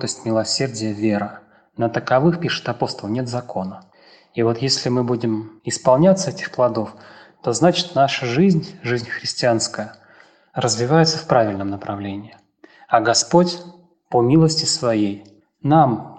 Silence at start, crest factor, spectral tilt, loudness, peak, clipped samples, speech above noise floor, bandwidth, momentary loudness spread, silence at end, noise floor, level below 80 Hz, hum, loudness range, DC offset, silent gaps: 0 s; 18 dB; -5 dB/octave; -19 LUFS; -2 dBFS; under 0.1%; 32 dB; 9.8 kHz; 13 LU; 0 s; -51 dBFS; -58 dBFS; none; 4 LU; under 0.1%; none